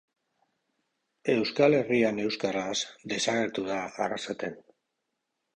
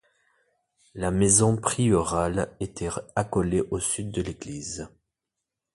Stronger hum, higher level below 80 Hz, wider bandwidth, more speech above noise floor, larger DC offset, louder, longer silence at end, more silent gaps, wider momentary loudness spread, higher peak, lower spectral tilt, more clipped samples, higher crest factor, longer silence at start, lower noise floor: neither; second, -70 dBFS vs -46 dBFS; second, 10 kHz vs 11.5 kHz; second, 54 dB vs 60 dB; neither; second, -28 LUFS vs -25 LUFS; about the same, 0.95 s vs 0.9 s; neither; second, 11 LU vs 16 LU; second, -10 dBFS vs -4 dBFS; about the same, -4 dB/octave vs -5 dB/octave; neither; about the same, 20 dB vs 22 dB; first, 1.25 s vs 0.95 s; about the same, -82 dBFS vs -85 dBFS